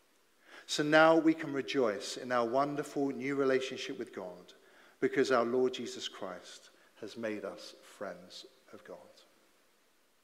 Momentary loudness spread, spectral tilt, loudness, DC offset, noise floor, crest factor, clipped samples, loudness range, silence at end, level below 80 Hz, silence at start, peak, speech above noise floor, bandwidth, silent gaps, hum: 23 LU; -4.5 dB/octave; -32 LUFS; under 0.1%; -71 dBFS; 22 dB; under 0.1%; 15 LU; 1.2 s; -82 dBFS; 0.5 s; -12 dBFS; 39 dB; 15 kHz; none; none